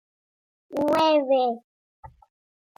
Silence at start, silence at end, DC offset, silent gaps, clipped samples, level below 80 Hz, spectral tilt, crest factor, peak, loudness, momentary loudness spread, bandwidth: 0.7 s; 0.7 s; under 0.1%; 1.64-2.03 s; under 0.1%; -64 dBFS; -5 dB/octave; 16 dB; -10 dBFS; -23 LUFS; 14 LU; 16 kHz